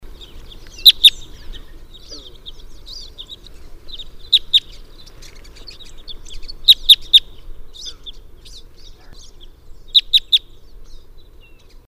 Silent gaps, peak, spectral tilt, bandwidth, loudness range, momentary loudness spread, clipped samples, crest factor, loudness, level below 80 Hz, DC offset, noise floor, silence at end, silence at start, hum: none; 0 dBFS; 1 dB/octave; 15.5 kHz; 6 LU; 28 LU; 0.1%; 20 dB; -11 LUFS; -36 dBFS; under 0.1%; -42 dBFS; 0.7 s; 0.05 s; none